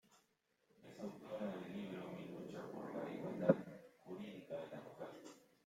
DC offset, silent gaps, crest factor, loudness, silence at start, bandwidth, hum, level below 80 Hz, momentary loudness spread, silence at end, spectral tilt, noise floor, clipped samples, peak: under 0.1%; none; 30 dB; -46 LUFS; 0.1 s; 16 kHz; none; -84 dBFS; 19 LU; 0.2 s; -7.5 dB/octave; -81 dBFS; under 0.1%; -16 dBFS